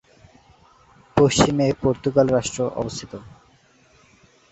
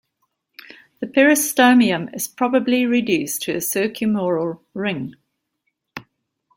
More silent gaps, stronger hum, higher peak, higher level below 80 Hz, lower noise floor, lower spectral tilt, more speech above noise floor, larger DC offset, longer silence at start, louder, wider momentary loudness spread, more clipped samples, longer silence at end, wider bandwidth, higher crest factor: neither; neither; about the same, -2 dBFS vs -2 dBFS; first, -46 dBFS vs -64 dBFS; second, -56 dBFS vs -74 dBFS; about the same, -5 dB/octave vs -4 dB/octave; second, 36 dB vs 56 dB; neither; first, 1.15 s vs 1 s; about the same, -20 LUFS vs -19 LUFS; second, 16 LU vs 19 LU; neither; first, 1.2 s vs 0.6 s; second, 8.2 kHz vs 16.5 kHz; about the same, 22 dB vs 18 dB